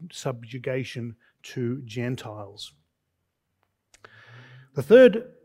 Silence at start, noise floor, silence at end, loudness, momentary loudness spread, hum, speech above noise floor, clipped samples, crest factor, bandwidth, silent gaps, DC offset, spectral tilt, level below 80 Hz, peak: 0 s; -78 dBFS; 0.2 s; -22 LUFS; 24 LU; none; 55 dB; under 0.1%; 22 dB; 13 kHz; none; under 0.1%; -6.5 dB/octave; -70 dBFS; -4 dBFS